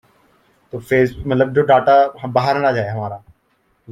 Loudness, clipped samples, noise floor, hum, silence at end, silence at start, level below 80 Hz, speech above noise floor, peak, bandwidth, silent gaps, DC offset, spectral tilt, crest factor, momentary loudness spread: -16 LUFS; under 0.1%; -62 dBFS; none; 0 s; 0.75 s; -48 dBFS; 47 dB; -2 dBFS; 15 kHz; none; under 0.1%; -7.5 dB/octave; 16 dB; 18 LU